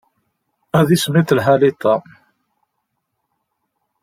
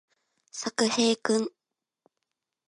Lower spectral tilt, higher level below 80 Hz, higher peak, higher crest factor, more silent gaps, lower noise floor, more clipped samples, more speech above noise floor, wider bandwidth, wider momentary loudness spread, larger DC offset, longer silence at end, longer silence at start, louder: first, -6 dB/octave vs -3 dB/octave; first, -56 dBFS vs -80 dBFS; first, -2 dBFS vs -8 dBFS; about the same, 18 dB vs 22 dB; neither; second, -74 dBFS vs -84 dBFS; neither; about the same, 59 dB vs 58 dB; first, 16 kHz vs 11 kHz; second, 5 LU vs 13 LU; neither; first, 2.05 s vs 1.2 s; first, 0.75 s vs 0.55 s; first, -15 LUFS vs -27 LUFS